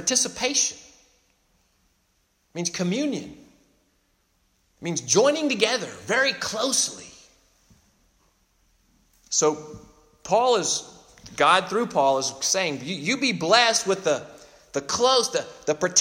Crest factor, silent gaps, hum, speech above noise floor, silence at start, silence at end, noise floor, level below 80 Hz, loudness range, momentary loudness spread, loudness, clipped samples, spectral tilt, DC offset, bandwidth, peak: 22 dB; none; none; 45 dB; 0 s; 0 s; -68 dBFS; -64 dBFS; 10 LU; 13 LU; -23 LUFS; under 0.1%; -2 dB/octave; under 0.1%; 16 kHz; -2 dBFS